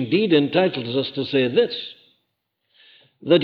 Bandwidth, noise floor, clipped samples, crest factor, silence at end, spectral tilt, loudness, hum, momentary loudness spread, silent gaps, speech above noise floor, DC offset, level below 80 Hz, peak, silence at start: 5.6 kHz; -75 dBFS; under 0.1%; 18 dB; 0 s; -8.5 dB/octave; -20 LUFS; none; 14 LU; none; 55 dB; under 0.1%; -68 dBFS; -4 dBFS; 0 s